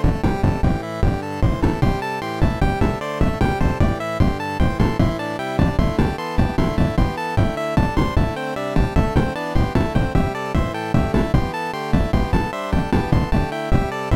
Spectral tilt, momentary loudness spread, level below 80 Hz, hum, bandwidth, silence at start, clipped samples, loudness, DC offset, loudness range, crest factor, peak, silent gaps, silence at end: -7.5 dB/octave; 3 LU; -24 dBFS; none; 16 kHz; 0 s; under 0.1%; -21 LUFS; under 0.1%; 1 LU; 12 dB; -6 dBFS; none; 0 s